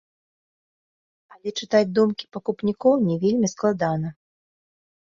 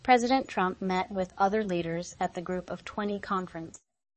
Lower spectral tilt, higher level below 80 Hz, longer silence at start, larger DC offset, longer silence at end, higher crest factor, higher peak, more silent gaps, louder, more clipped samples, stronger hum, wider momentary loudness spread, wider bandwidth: about the same, -6 dB/octave vs -5.5 dB/octave; about the same, -62 dBFS vs -60 dBFS; first, 1.45 s vs 0.05 s; neither; first, 0.95 s vs 0.45 s; about the same, 18 dB vs 20 dB; first, -6 dBFS vs -10 dBFS; neither; first, -22 LUFS vs -30 LUFS; neither; neither; about the same, 11 LU vs 10 LU; second, 7.6 kHz vs 8.6 kHz